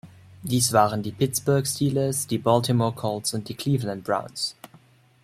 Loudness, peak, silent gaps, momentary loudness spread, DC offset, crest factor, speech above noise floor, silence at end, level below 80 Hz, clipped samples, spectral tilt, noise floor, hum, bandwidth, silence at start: -24 LUFS; -4 dBFS; none; 9 LU; under 0.1%; 22 dB; 31 dB; 0.7 s; -60 dBFS; under 0.1%; -5 dB/octave; -55 dBFS; none; 16 kHz; 0.05 s